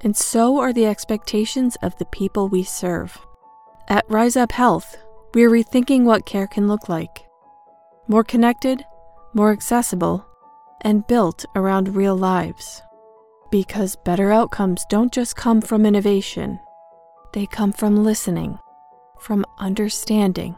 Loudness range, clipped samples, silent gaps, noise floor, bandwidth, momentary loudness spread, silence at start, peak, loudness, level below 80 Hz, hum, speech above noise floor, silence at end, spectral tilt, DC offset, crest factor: 4 LU; under 0.1%; none; -51 dBFS; 16.5 kHz; 11 LU; 0 s; 0 dBFS; -19 LUFS; -46 dBFS; none; 33 dB; 0.05 s; -5.5 dB/octave; under 0.1%; 20 dB